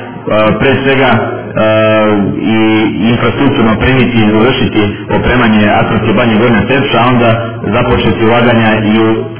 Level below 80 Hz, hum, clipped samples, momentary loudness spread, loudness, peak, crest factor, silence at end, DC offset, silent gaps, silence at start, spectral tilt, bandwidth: -30 dBFS; none; 0.3%; 5 LU; -9 LUFS; 0 dBFS; 8 dB; 0 s; 3%; none; 0 s; -10.5 dB/octave; 4 kHz